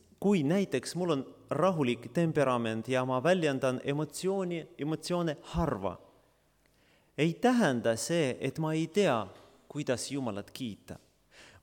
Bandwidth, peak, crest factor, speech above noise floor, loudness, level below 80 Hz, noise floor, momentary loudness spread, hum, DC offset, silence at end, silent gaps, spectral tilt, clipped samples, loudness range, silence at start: 18 kHz; -14 dBFS; 16 dB; 38 dB; -31 LUFS; -58 dBFS; -69 dBFS; 12 LU; none; under 0.1%; 0.15 s; none; -5.5 dB/octave; under 0.1%; 4 LU; 0.2 s